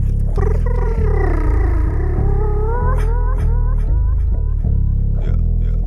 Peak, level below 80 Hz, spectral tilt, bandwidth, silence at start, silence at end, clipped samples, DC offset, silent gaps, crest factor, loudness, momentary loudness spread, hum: -4 dBFS; -16 dBFS; -10 dB/octave; 2.6 kHz; 0 s; 0 s; under 0.1%; under 0.1%; none; 10 dB; -19 LUFS; 2 LU; none